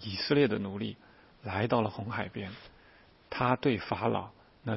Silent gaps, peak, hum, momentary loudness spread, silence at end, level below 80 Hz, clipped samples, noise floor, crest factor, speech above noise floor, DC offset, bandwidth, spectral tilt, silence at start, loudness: none; -10 dBFS; none; 17 LU; 0 s; -62 dBFS; under 0.1%; -59 dBFS; 22 dB; 29 dB; under 0.1%; 5.8 kHz; -10 dB/octave; 0 s; -31 LUFS